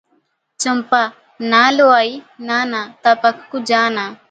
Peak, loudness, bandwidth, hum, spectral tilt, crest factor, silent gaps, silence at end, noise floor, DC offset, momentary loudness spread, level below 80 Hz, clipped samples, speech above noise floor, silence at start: 0 dBFS; -15 LUFS; 9.4 kHz; none; -2.5 dB/octave; 16 dB; none; 0.15 s; -63 dBFS; under 0.1%; 12 LU; -70 dBFS; under 0.1%; 47 dB; 0.6 s